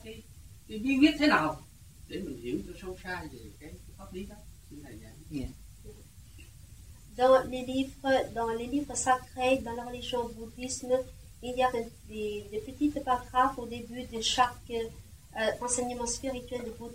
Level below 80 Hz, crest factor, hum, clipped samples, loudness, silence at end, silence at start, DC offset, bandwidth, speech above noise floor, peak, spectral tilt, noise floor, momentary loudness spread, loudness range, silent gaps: -52 dBFS; 22 dB; none; under 0.1%; -31 LUFS; 0 s; 0 s; under 0.1%; 16 kHz; 21 dB; -10 dBFS; -3.5 dB/octave; -52 dBFS; 23 LU; 14 LU; none